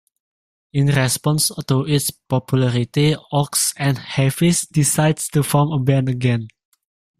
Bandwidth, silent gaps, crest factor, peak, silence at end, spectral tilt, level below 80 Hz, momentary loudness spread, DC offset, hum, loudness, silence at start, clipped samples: 15.5 kHz; none; 16 dB; -2 dBFS; 0.7 s; -5 dB/octave; -52 dBFS; 4 LU; under 0.1%; none; -18 LUFS; 0.75 s; under 0.1%